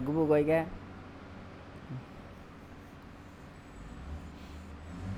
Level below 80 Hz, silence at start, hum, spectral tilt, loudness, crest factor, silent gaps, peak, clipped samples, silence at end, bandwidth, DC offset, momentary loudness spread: -52 dBFS; 0 s; none; -8 dB/octave; -32 LUFS; 20 dB; none; -16 dBFS; under 0.1%; 0 s; 13.5 kHz; under 0.1%; 23 LU